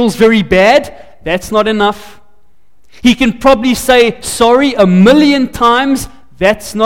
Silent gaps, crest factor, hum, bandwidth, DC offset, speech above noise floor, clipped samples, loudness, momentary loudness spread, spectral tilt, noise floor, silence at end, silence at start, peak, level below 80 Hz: none; 10 dB; none; 17 kHz; 2%; 46 dB; under 0.1%; -10 LUFS; 10 LU; -5 dB/octave; -55 dBFS; 0 s; 0 s; 0 dBFS; -34 dBFS